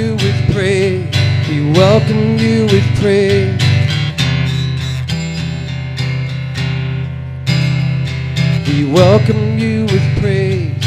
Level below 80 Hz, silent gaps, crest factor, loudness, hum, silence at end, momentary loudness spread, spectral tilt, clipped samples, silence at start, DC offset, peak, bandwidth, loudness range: -38 dBFS; none; 12 dB; -14 LUFS; none; 0 s; 9 LU; -6.5 dB/octave; under 0.1%; 0 s; under 0.1%; 0 dBFS; 11.5 kHz; 6 LU